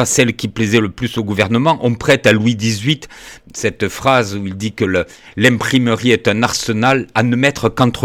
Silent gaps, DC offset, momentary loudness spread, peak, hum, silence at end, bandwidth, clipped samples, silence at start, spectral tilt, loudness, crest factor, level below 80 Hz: none; under 0.1%; 8 LU; -2 dBFS; none; 0 s; 17 kHz; under 0.1%; 0 s; -4.5 dB/octave; -15 LUFS; 14 dB; -44 dBFS